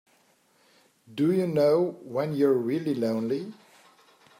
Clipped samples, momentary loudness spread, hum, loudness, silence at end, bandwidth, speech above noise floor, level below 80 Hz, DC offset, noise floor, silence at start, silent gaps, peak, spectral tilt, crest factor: under 0.1%; 9 LU; none; -26 LUFS; 0.85 s; 16 kHz; 39 dB; -76 dBFS; under 0.1%; -64 dBFS; 1.1 s; none; -12 dBFS; -8 dB/octave; 16 dB